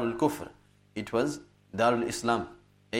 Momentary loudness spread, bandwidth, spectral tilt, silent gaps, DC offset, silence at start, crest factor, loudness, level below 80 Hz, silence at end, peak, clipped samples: 17 LU; 16 kHz; -5 dB/octave; none; under 0.1%; 0 s; 20 dB; -29 LUFS; -62 dBFS; 0 s; -10 dBFS; under 0.1%